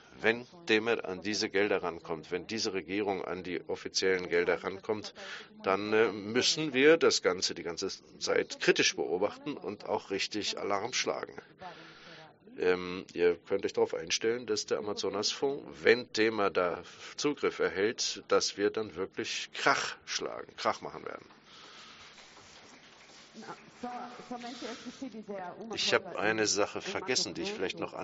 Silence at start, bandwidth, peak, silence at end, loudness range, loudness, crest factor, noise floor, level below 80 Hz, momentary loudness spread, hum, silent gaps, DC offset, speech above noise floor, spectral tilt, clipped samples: 0.15 s; 8 kHz; -8 dBFS; 0 s; 13 LU; -31 LUFS; 24 dB; -55 dBFS; -72 dBFS; 16 LU; none; none; under 0.1%; 23 dB; -1.5 dB/octave; under 0.1%